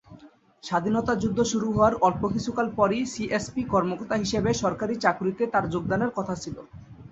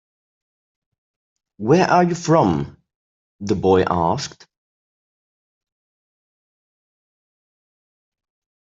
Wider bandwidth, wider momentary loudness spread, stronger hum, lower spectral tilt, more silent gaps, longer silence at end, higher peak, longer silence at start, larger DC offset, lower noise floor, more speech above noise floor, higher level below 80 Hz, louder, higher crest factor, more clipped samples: about the same, 8.2 kHz vs 7.8 kHz; second, 7 LU vs 15 LU; neither; about the same, -5.5 dB/octave vs -6.5 dB/octave; second, none vs 2.95-3.39 s; second, 0.05 s vs 4.45 s; second, -6 dBFS vs -2 dBFS; second, 0.1 s vs 1.6 s; neither; second, -52 dBFS vs under -90 dBFS; second, 26 dB vs over 73 dB; about the same, -50 dBFS vs -54 dBFS; second, -25 LUFS vs -18 LUFS; about the same, 20 dB vs 22 dB; neither